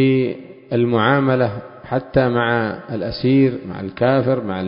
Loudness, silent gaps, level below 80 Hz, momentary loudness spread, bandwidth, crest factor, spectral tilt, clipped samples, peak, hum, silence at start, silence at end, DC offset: -18 LUFS; none; -46 dBFS; 10 LU; 5.4 kHz; 16 dB; -12 dB/octave; under 0.1%; -2 dBFS; none; 0 s; 0 s; under 0.1%